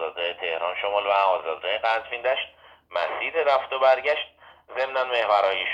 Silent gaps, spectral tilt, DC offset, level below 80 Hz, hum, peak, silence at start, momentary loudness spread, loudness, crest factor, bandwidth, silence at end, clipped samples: none; -2.5 dB/octave; under 0.1%; -68 dBFS; none; -8 dBFS; 0 s; 8 LU; -24 LUFS; 18 dB; 7.6 kHz; 0 s; under 0.1%